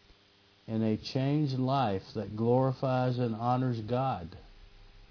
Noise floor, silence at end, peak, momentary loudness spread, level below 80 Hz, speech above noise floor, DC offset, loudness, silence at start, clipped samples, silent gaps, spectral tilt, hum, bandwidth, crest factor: -63 dBFS; 0.05 s; -14 dBFS; 9 LU; -60 dBFS; 33 dB; under 0.1%; -31 LUFS; 0.7 s; under 0.1%; none; -8.5 dB/octave; none; 5.4 kHz; 16 dB